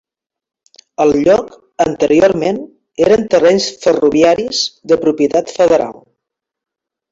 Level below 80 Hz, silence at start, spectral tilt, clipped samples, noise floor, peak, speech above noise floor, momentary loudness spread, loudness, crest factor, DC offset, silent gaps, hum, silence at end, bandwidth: -48 dBFS; 1 s; -4.5 dB/octave; under 0.1%; -78 dBFS; 0 dBFS; 66 dB; 8 LU; -13 LUFS; 14 dB; under 0.1%; none; none; 1.2 s; 7.8 kHz